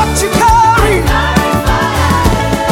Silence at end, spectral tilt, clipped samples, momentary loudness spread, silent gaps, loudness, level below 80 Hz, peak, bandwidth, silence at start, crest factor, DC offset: 0 s; -4.5 dB/octave; under 0.1%; 4 LU; none; -10 LUFS; -18 dBFS; 0 dBFS; 18 kHz; 0 s; 10 dB; under 0.1%